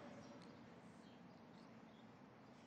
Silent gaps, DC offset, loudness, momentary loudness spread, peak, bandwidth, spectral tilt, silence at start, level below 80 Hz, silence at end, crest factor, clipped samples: none; under 0.1%; -62 LUFS; 4 LU; -46 dBFS; 9 kHz; -6 dB/octave; 0 s; -88 dBFS; 0 s; 14 dB; under 0.1%